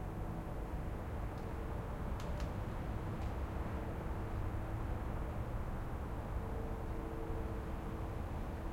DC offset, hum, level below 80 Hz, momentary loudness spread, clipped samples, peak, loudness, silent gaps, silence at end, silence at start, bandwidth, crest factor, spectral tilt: under 0.1%; none; -44 dBFS; 2 LU; under 0.1%; -28 dBFS; -43 LUFS; none; 0 s; 0 s; 16.5 kHz; 12 dB; -7.5 dB/octave